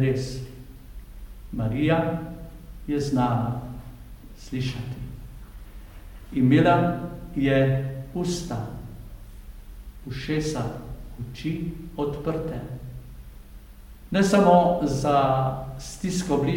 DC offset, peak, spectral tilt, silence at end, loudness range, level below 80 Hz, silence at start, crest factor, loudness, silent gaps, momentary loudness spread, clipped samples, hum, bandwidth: under 0.1%; -6 dBFS; -6.5 dB/octave; 0 s; 10 LU; -42 dBFS; 0 s; 20 dB; -25 LUFS; none; 26 LU; under 0.1%; none; 17 kHz